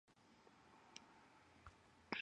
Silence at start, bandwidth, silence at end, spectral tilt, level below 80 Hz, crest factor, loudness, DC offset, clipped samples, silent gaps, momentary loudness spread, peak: 0.05 s; 10.5 kHz; 0 s; -3 dB/octave; -80 dBFS; 30 dB; -61 LUFS; under 0.1%; under 0.1%; none; 9 LU; -28 dBFS